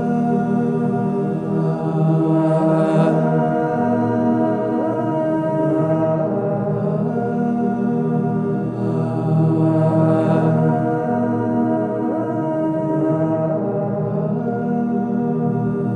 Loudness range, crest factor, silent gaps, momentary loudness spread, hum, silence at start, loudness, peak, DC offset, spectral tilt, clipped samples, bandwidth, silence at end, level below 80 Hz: 3 LU; 14 dB; none; 5 LU; none; 0 s; -19 LUFS; -4 dBFS; under 0.1%; -10.5 dB/octave; under 0.1%; 4.7 kHz; 0 s; -56 dBFS